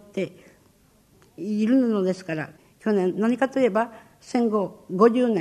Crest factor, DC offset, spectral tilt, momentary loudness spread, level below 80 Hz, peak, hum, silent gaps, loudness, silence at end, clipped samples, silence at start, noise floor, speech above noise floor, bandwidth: 18 dB; under 0.1%; -7 dB/octave; 12 LU; -68 dBFS; -6 dBFS; none; none; -23 LUFS; 0 s; under 0.1%; 0.15 s; -59 dBFS; 36 dB; 11 kHz